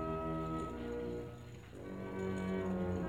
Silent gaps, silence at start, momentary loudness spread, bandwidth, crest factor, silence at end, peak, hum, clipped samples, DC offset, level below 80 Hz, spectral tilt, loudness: none; 0 s; 12 LU; 14 kHz; 14 dB; 0 s; -26 dBFS; 60 Hz at -55 dBFS; under 0.1%; under 0.1%; -54 dBFS; -8 dB/octave; -41 LUFS